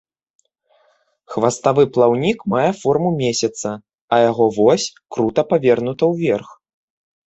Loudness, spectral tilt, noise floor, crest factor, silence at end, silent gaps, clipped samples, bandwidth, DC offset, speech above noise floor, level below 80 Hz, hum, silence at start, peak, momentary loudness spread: -17 LUFS; -5.5 dB/octave; -60 dBFS; 16 dB; 0.75 s; 4.01-4.08 s; under 0.1%; 8.2 kHz; under 0.1%; 44 dB; -58 dBFS; none; 1.3 s; -2 dBFS; 9 LU